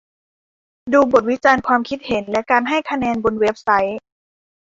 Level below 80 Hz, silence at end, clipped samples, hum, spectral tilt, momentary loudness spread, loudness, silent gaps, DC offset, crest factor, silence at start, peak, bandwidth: -52 dBFS; 0.65 s; under 0.1%; none; -5 dB/octave; 8 LU; -17 LUFS; none; under 0.1%; 18 dB; 0.85 s; -2 dBFS; 7.8 kHz